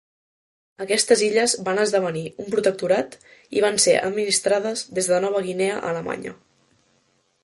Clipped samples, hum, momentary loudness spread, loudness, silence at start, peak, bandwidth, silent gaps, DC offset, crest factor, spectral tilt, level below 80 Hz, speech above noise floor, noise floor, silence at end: under 0.1%; none; 11 LU; -21 LUFS; 0.8 s; -2 dBFS; 12 kHz; none; under 0.1%; 20 dB; -2.5 dB/octave; -66 dBFS; 44 dB; -65 dBFS; 1.1 s